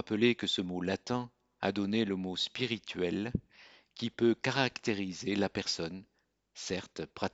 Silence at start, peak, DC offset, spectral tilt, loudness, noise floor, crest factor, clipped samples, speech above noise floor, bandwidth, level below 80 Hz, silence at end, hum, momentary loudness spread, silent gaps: 0 s; -12 dBFS; under 0.1%; -4.5 dB/octave; -34 LUFS; -60 dBFS; 22 dB; under 0.1%; 27 dB; 8 kHz; -62 dBFS; 0.05 s; none; 11 LU; none